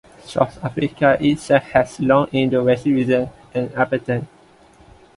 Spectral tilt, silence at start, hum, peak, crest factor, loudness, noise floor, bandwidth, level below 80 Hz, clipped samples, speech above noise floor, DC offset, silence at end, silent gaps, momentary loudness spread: -7 dB/octave; 0.25 s; none; 0 dBFS; 18 dB; -19 LUFS; -49 dBFS; 11.5 kHz; -50 dBFS; under 0.1%; 31 dB; under 0.1%; 0.9 s; none; 9 LU